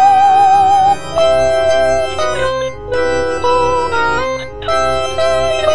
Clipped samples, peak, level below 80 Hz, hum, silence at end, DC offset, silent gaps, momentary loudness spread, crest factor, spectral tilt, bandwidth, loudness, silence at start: under 0.1%; 0 dBFS; -34 dBFS; none; 0 s; 6%; none; 9 LU; 12 dB; -3.5 dB/octave; 10 kHz; -13 LUFS; 0 s